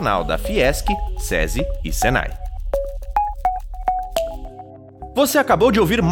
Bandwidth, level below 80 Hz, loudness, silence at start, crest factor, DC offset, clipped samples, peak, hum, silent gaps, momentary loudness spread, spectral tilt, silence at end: 18.5 kHz; -28 dBFS; -20 LUFS; 0 s; 16 dB; under 0.1%; under 0.1%; -4 dBFS; none; none; 15 LU; -4.5 dB/octave; 0 s